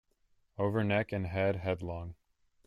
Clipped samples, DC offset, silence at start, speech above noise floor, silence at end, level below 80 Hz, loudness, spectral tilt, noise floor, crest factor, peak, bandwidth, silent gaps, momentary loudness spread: under 0.1%; under 0.1%; 0.6 s; 39 dB; 0.5 s; -60 dBFS; -33 LUFS; -8.5 dB/octave; -72 dBFS; 18 dB; -16 dBFS; 10 kHz; none; 14 LU